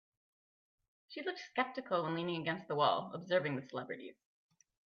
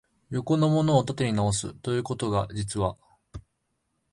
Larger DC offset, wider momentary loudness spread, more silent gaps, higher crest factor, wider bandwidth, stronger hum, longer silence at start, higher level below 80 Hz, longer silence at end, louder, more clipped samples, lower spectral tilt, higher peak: neither; second, 13 LU vs 22 LU; neither; about the same, 22 dB vs 20 dB; second, 6.8 kHz vs 11.5 kHz; neither; first, 1.1 s vs 0.3 s; second, -86 dBFS vs -50 dBFS; about the same, 0.75 s vs 0.7 s; second, -37 LUFS vs -26 LUFS; neither; second, -3.5 dB/octave vs -6 dB/octave; second, -16 dBFS vs -8 dBFS